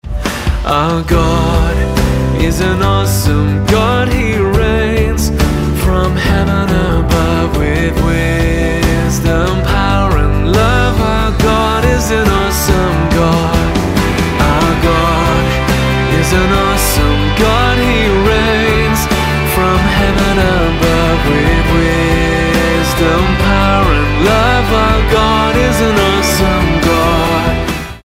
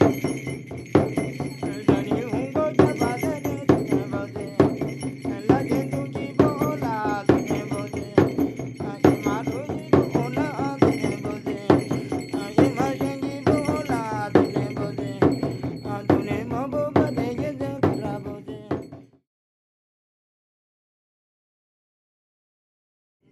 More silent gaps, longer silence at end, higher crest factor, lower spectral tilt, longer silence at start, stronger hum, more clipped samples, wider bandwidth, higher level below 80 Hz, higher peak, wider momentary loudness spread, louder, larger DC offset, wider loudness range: neither; second, 0.05 s vs 4.3 s; second, 10 dB vs 22 dB; second, -5.5 dB/octave vs -7.5 dB/octave; about the same, 0.05 s vs 0 s; neither; neither; first, 16.5 kHz vs 13 kHz; first, -18 dBFS vs -52 dBFS; about the same, 0 dBFS vs -2 dBFS; second, 3 LU vs 9 LU; first, -12 LUFS vs -24 LUFS; neither; second, 2 LU vs 5 LU